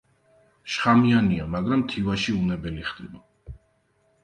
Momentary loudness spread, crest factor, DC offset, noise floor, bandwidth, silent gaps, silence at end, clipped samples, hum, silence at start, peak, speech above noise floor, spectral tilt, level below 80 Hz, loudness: 18 LU; 20 dB; under 0.1%; -66 dBFS; 9.4 kHz; none; 0.7 s; under 0.1%; none; 0.65 s; -4 dBFS; 43 dB; -6.5 dB/octave; -46 dBFS; -23 LUFS